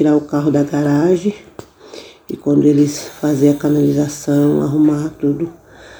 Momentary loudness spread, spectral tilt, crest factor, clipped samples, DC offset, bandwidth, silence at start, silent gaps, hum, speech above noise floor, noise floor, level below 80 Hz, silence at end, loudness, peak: 13 LU; -7 dB/octave; 14 dB; under 0.1%; under 0.1%; over 20 kHz; 0 s; none; none; 23 dB; -37 dBFS; -50 dBFS; 0 s; -15 LUFS; -2 dBFS